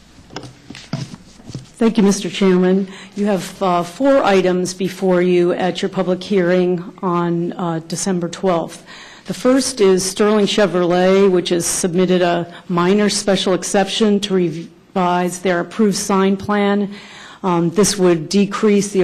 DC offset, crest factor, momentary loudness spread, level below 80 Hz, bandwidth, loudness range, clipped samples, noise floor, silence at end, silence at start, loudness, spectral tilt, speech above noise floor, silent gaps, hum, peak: under 0.1%; 12 dB; 15 LU; -52 dBFS; 15 kHz; 4 LU; under 0.1%; -37 dBFS; 0 s; 0.35 s; -16 LUFS; -5 dB/octave; 21 dB; none; none; -4 dBFS